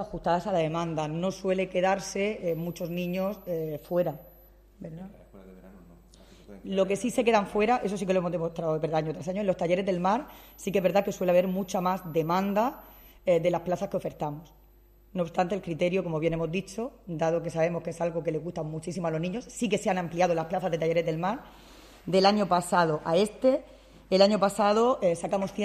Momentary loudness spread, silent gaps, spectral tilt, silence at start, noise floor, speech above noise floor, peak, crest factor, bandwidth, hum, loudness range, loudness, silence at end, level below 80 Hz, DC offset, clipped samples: 10 LU; none; -6 dB/octave; 0 s; -57 dBFS; 30 dB; -8 dBFS; 20 dB; 14.5 kHz; none; 7 LU; -28 LUFS; 0 s; -56 dBFS; under 0.1%; under 0.1%